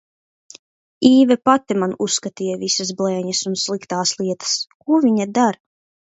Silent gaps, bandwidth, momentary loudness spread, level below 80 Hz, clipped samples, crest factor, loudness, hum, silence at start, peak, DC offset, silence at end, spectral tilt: 4.75-4.80 s; 8.2 kHz; 9 LU; -66 dBFS; under 0.1%; 18 dB; -18 LUFS; none; 1 s; 0 dBFS; under 0.1%; 0.6 s; -4 dB/octave